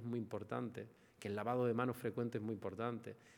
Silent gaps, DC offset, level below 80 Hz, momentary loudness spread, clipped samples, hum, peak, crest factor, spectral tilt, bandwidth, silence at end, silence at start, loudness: none; under 0.1%; -82 dBFS; 12 LU; under 0.1%; none; -24 dBFS; 20 dB; -7.5 dB/octave; 18 kHz; 0 s; 0 s; -42 LUFS